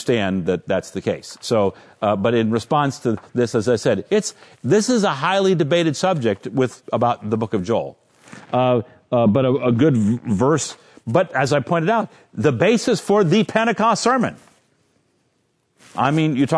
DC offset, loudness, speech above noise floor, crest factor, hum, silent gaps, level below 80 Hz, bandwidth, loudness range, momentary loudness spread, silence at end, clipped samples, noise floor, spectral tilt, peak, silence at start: under 0.1%; -19 LUFS; 48 dB; 18 dB; none; none; -60 dBFS; 11 kHz; 3 LU; 8 LU; 0 s; under 0.1%; -66 dBFS; -5.5 dB/octave; -2 dBFS; 0 s